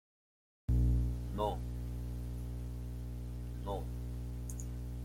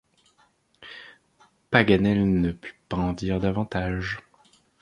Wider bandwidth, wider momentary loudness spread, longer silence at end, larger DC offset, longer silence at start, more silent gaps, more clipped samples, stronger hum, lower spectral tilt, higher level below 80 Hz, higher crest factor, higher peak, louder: first, 16 kHz vs 10 kHz; second, 11 LU vs 22 LU; second, 0 s vs 0.6 s; neither; about the same, 0.7 s vs 0.8 s; neither; neither; first, 60 Hz at -40 dBFS vs none; about the same, -7.5 dB/octave vs -7.5 dB/octave; about the same, -40 dBFS vs -44 dBFS; second, 16 dB vs 24 dB; second, -22 dBFS vs -2 dBFS; second, -39 LUFS vs -24 LUFS